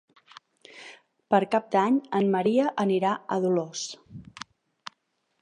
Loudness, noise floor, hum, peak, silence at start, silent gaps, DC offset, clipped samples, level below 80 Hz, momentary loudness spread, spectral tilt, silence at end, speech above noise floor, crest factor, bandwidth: -25 LUFS; -74 dBFS; none; -8 dBFS; 0.75 s; none; under 0.1%; under 0.1%; -72 dBFS; 22 LU; -5.5 dB/octave; 1.2 s; 49 dB; 20 dB; 10.5 kHz